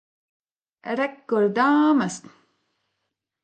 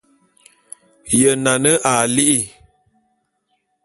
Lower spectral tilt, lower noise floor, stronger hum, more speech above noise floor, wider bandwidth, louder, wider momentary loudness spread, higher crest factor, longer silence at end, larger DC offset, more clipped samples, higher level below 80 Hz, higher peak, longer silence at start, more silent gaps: first, -5.5 dB/octave vs -3 dB/octave; first, -80 dBFS vs -69 dBFS; neither; first, 59 dB vs 53 dB; second, 9 kHz vs 12 kHz; second, -22 LUFS vs -15 LUFS; first, 15 LU vs 8 LU; about the same, 18 dB vs 20 dB; about the same, 1.25 s vs 1.35 s; neither; neither; second, -76 dBFS vs -54 dBFS; second, -6 dBFS vs 0 dBFS; second, 0.85 s vs 1.05 s; neither